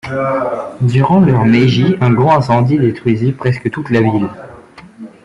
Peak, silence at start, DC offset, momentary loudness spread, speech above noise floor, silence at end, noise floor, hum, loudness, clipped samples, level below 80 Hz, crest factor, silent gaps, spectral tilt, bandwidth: -2 dBFS; 0.05 s; under 0.1%; 8 LU; 24 dB; 0.15 s; -36 dBFS; none; -13 LUFS; under 0.1%; -46 dBFS; 12 dB; none; -8.5 dB/octave; 7.6 kHz